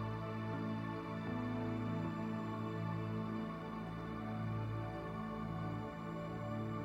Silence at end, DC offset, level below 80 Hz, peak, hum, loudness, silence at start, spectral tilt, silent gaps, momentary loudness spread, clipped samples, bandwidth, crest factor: 0 s; under 0.1%; -60 dBFS; -28 dBFS; none; -42 LUFS; 0 s; -8.5 dB/octave; none; 4 LU; under 0.1%; 8 kHz; 12 dB